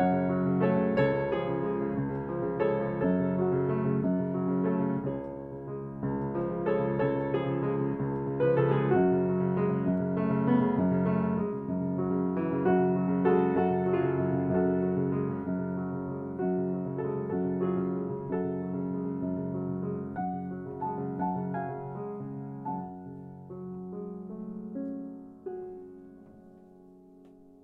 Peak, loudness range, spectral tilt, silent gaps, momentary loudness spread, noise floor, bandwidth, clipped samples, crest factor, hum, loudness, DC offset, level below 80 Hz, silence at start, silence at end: -12 dBFS; 12 LU; -11.5 dB/octave; none; 14 LU; -54 dBFS; 4.2 kHz; under 0.1%; 18 dB; none; -30 LUFS; under 0.1%; -60 dBFS; 0 s; 0.2 s